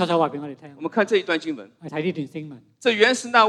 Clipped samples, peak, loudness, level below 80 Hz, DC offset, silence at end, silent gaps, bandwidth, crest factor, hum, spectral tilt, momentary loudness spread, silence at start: under 0.1%; -2 dBFS; -22 LUFS; -78 dBFS; under 0.1%; 0 s; none; 12 kHz; 22 dB; none; -4 dB/octave; 17 LU; 0 s